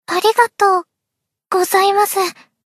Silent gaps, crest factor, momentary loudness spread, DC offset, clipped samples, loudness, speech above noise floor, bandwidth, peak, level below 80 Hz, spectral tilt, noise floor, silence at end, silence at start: none; 16 dB; 7 LU; under 0.1%; under 0.1%; -15 LUFS; 65 dB; 13.5 kHz; 0 dBFS; -76 dBFS; -1 dB/octave; -80 dBFS; 0.35 s; 0.1 s